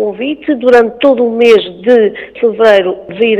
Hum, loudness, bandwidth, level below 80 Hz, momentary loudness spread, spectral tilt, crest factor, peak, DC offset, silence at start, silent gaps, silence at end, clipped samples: none; -10 LUFS; 8.6 kHz; -50 dBFS; 8 LU; -5.5 dB/octave; 10 dB; 0 dBFS; under 0.1%; 0 s; none; 0 s; 3%